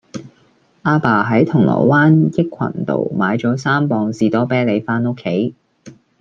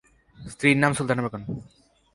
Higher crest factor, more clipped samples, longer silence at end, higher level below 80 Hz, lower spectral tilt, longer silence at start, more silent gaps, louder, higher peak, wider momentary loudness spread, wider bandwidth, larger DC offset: second, 16 dB vs 22 dB; neither; second, 0.3 s vs 0.5 s; about the same, -56 dBFS vs -56 dBFS; first, -8 dB/octave vs -5.5 dB/octave; second, 0.15 s vs 0.4 s; neither; first, -16 LUFS vs -23 LUFS; first, 0 dBFS vs -6 dBFS; second, 8 LU vs 21 LU; second, 7.6 kHz vs 11.5 kHz; neither